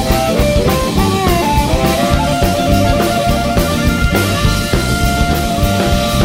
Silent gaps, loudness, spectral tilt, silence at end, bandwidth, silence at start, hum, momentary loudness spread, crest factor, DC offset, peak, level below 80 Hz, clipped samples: none; -13 LUFS; -5 dB/octave; 0 s; 16.5 kHz; 0 s; none; 2 LU; 12 dB; under 0.1%; 0 dBFS; -20 dBFS; under 0.1%